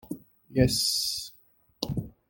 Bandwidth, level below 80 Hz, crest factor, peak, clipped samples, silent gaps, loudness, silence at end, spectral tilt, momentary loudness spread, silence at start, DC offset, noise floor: 17 kHz; -48 dBFS; 22 dB; -8 dBFS; under 0.1%; none; -27 LUFS; 0.2 s; -4 dB/octave; 19 LU; 0.05 s; under 0.1%; -62 dBFS